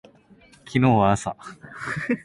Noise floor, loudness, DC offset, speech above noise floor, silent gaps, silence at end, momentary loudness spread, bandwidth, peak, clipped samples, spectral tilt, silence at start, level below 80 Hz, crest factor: -53 dBFS; -22 LUFS; under 0.1%; 31 dB; none; 0.05 s; 19 LU; 11.5 kHz; -6 dBFS; under 0.1%; -6.5 dB/octave; 0.65 s; -50 dBFS; 18 dB